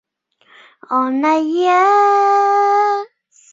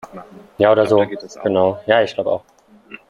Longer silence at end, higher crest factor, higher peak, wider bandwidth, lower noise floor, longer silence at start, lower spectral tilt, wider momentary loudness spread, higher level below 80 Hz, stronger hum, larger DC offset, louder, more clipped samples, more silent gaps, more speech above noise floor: first, 0.45 s vs 0.15 s; about the same, 12 dB vs 16 dB; about the same, -4 dBFS vs -2 dBFS; second, 7.8 kHz vs 11.5 kHz; first, -56 dBFS vs -42 dBFS; first, 0.9 s vs 0.15 s; second, -3 dB/octave vs -6 dB/octave; second, 8 LU vs 11 LU; second, -70 dBFS vs -60 dBFS; neither; neither; first, -14 LUFS vs -17 LUFS; neither; neither; first, 42 dB vs 26 dB